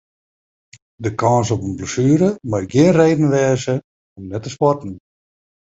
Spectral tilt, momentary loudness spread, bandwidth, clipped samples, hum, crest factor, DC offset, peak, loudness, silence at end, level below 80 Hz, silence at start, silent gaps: -6.5 dB/octave; 14 LU; 8 kHz; under 0.1%; none; 16 dB; under 0.1%; -2 dBFS; -17 LUFS; 0.8 s; -48 dBFS; 1 s; 3.84-4.16 s